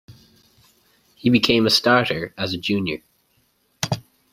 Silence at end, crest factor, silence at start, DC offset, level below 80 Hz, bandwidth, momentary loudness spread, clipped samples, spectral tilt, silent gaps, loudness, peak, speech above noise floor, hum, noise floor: 0.3 s; 20 dB; 0.1 s; under 0.1%; -54 dBFS; 16 kHz; 13 LU; under 0.1%; -4.5 dB/octave; none; -20 LUFS; -2 dBFS; 45 dB; none; -64 dBFS